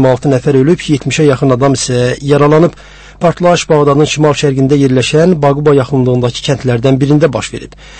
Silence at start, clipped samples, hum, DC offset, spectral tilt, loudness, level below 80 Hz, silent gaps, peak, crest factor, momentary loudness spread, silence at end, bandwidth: 0 s; 0.3%; none; under 0.1%; -6 dB/octave; -10 LUFS; -36 dBFS; none; 0 dBFS; 10 dB; 5 LU; 0 s; 8.8 kHz